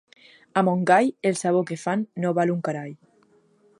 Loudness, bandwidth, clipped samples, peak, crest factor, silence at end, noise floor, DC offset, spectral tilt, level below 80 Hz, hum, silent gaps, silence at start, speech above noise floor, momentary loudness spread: -23 LUFS; 11.5 kHz; under 0.1%; -4 dBFS; 20 dB; 0.85 s; -60 dBFS; under 0.1%; -6 dB/octave; -76 dBFS; none; none; 0.55 s; 38 dB; 10 LU